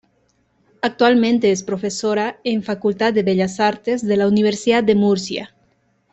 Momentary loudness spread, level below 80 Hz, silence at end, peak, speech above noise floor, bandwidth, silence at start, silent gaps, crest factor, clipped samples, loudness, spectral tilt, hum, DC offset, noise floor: 8 LU; -58 dBFS; 0.65 s; -2 dBFS; 45 dB; 8.4 kHz; 0.85 s; none; 16 dB; under 0.1%; -18 LUFS; -5 dB/octave; none; under 0.1%; -62 dBFS